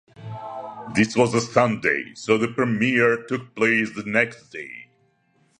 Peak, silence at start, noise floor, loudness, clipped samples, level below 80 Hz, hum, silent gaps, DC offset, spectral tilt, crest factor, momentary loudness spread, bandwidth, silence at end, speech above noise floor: -2 dBFS; 0.2 s; -64 dBFS; -21 LUFS; under 0.1%; -60 dBFS; none; none; under 0.1%; -5.5 dB/octave; 22 dB; 16 LU; 11 kHz; 0.75 s; 42 dB